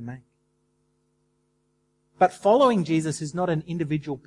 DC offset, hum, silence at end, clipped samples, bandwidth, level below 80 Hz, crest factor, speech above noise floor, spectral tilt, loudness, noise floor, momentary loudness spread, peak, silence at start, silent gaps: under 0.1%; none; 0.05 s; under 0.1%; 11.5 kHz; -64 dBFS; 18 dB; 48 dB; -6.5 dB/octave; -23 LUFS; -70 dBFS; 9 LU; -8 dBFS; 0 s; none